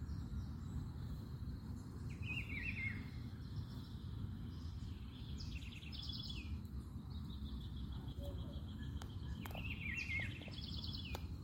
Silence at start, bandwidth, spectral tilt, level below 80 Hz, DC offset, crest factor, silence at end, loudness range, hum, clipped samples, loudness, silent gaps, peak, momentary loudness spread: 0 s; 16.5 kHz; -6 dB/octave; -52 dBFS; under 0.1%; 20 dB; 0 s; 3 LU; none; under 0.1%; -47 LUFS; none; -26 dBFS; 7 LU